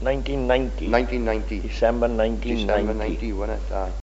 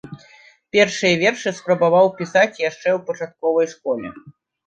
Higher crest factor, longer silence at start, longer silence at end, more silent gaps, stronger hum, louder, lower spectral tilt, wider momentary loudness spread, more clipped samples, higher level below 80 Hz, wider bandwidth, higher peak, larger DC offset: about the same, 20 dB vs 18 dB; about the same, 0 s vs 0.05 s; second, 0 s vs 0.4 s; neither; neither; second, -24 LUFS vs -19 LUFS; about the same, -5 dB/octave vs -4.5 dB/octave; second, 6 LU vs 10 LU; neither; first, -28 dBFS vs -64 dBFS; second, 8 kHz vs 9 kHz; about the same, -4 dBFS vs -2 dBFS; neither